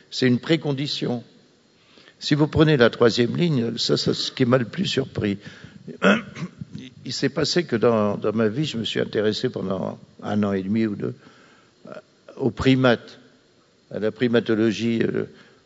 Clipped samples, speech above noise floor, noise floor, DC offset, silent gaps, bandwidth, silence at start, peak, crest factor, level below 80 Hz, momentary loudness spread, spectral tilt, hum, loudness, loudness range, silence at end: under 0.1%; 37 dB; -58 dBFS; under 0.1%; none; 8 kHz; 0.1 s; -2 dBFS; 22 dB; -54 dBFS; 17 LU; -6 dB/octave; none; -22 LUFS; 5 LU; 0.35 s